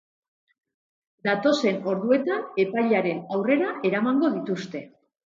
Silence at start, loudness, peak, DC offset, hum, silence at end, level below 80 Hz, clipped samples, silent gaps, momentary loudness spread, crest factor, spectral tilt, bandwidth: 1.25 s; -24 LUFS; -8 dBFS; under 0.1%; none; 0.45 s; -74 dBFS; under 0.1%; none; 8 LU; 16 dB; -6 dB/octave; 7.6 kHz